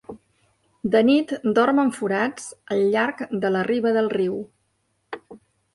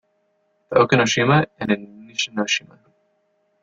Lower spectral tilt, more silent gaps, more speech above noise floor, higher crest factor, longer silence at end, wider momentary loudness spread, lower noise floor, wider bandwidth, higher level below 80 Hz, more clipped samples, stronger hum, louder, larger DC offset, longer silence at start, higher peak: about the same, -5.5 dB/octave vs -4.5 dB/octave; neither; about the same, 49 dB vs 48 dB; about the same, 16 dB vs 20 dB; second, 0.4 s vs 1.05 s; first, 20 LU vs 9 LU; about the same, -70 dBFS vs -67 dBFS; first, 11.5 kHz vs 7.8 kHz; second, -64 dBFS vs -58 dBFS; neither; neither; about the same, -22 LUFS vs -20 LUFS; neither; second, 0.1 s vs 0.7 s; second, -6 dBFS vs -2 dBFS